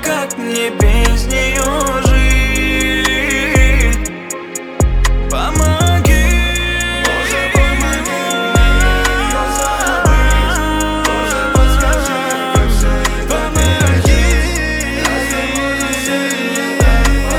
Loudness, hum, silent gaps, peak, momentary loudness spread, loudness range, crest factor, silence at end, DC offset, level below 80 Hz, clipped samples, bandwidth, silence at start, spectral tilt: -14 LUFS; none; none; 0 dBFS; 5 LU; 1 LU; 12 dB; 0 s; under 0.1%; -16 dBFS; under 0.1%; 16.5 kHz; 0 s; -4 dB/octave